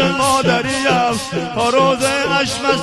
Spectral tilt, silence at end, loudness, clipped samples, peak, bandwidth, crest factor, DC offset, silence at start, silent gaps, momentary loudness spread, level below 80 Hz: -3.5 dB/octave; 0 s; -15 LUFS; under 0.1%; -2 dBFS; 13 kHz; 14 dB; under 0.1%; 0 s; none; 4 LU; -46 dBFS